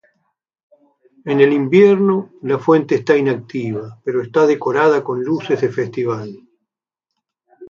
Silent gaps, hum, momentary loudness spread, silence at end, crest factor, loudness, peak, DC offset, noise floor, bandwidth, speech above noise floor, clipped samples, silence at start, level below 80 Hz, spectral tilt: none; none; 12 LU; 0.05 s; 16 dB; -16 LUFS; 0 dBFS; under 0.1%; -82 dBFS; 7.2 kHz; 66 dB; under 0.1%; 1.25 s; -64 dBFS; -7.5 dB/octave